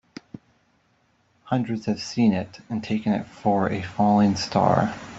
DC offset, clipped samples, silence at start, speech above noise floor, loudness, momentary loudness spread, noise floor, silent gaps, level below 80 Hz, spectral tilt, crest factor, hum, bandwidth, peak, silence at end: under 0.1%; under 0.1%; 1.45 s; 42 dB; -23 LUFS; 10 LU; -65 dBFS; none; -58 dBFS; -6.5 dB/octave; 20 dB; none; 8 kHz; -4 dBFS; 0 s